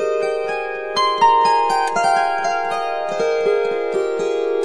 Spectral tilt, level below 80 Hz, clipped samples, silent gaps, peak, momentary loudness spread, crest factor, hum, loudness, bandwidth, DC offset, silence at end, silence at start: -3 dB/octave; -56 dBFS; under 0.1%; none; -4 dBFS; 8 LU; 14 dB; none; -18 LUFS; 10.5 kHz; 0.8%; 0 s; 0 s